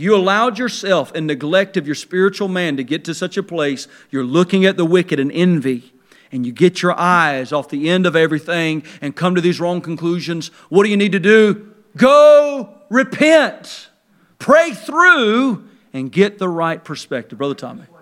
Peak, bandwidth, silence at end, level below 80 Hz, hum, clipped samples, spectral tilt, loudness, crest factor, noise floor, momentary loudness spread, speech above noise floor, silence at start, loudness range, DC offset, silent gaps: 0 dBFS; 13.5 kHz; 0.2 s; -68 dBFS; none; under 0.1%; -5.5 dB/octave; -15 LUFS; 16 dB; -56 dBFS; 15 LU; 41 dB; 0 s; 5 LU; under 0.1%; none